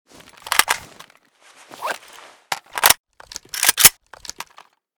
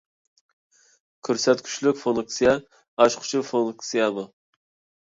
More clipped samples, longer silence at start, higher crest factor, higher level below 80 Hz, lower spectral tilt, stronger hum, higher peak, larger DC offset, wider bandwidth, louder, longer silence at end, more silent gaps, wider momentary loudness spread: neither; second, 0.45 s vs 1.25 s; about the same, 22 dB vs 22 dB; first, -54 dBFS vs -62 dBFS; second, 1.5 dB/octave vs -3.5 dB/octave; neither; first, 0 dBFS vs -4 dBFS; neither; first, over 20 kHz vs 7.8 kHz; first, -16 LUFS vs -23 LUFS; first, 1.05 s vs 0.75 s; about the same, 2.99-3.04 s vs 2.88-2.97 s; first, 25 LU vs 12 LU